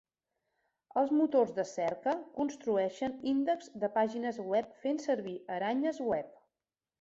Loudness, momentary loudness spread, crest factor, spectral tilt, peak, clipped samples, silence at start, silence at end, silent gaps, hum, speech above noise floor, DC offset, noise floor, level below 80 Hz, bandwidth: -33 LUFS; 8 LU; 16 dB; -5.5 dB/octave; -16 dBFS; under 0.1%; 0.95 s; 0.7 s; none; none; over 58 dB; under 0.1%; under -90 dBFS; -74 dBFS; 8 kHz